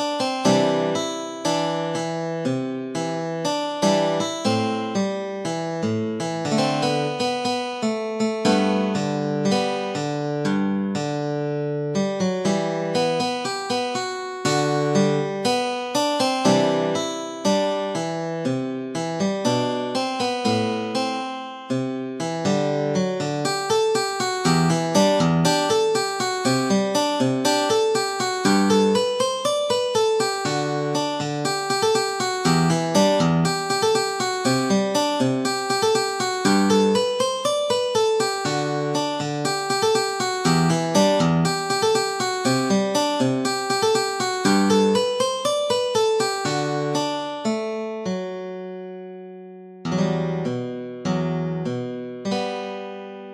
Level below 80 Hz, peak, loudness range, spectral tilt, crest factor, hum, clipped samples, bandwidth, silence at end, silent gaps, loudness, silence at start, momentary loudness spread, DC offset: -62 dBFS; -4 dBFS; 4 LU; -4.5 dB/octave; 18 dB; none; under 0.1%; 14.5 kHz; 0 s; none; -22 LUFS; 0 s; 8 LU; under 0.1%